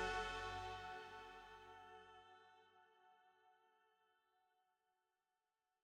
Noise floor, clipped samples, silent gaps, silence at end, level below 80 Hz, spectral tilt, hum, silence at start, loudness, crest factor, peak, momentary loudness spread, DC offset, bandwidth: under -90 dBFS; under 0.1%; none; 2.3 s; -68 dBFS; -3 dB/octave; none; 0 s; -51 LUFS; 22 dB; -32 dBFS; 20 LU; under 0.1%; 16 kHz